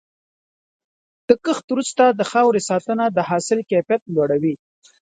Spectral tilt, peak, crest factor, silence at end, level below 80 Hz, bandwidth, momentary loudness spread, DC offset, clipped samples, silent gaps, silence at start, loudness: -5 dB/octave; 0 dBFS; 20 dB; 0.5 s; -64 dBFS; 9.6 kHz; 6 LU; under 0.1%; under 0.1%; 1.64-1.68 s, 4.02-4.06 s; 1.3 s; -19 LUFS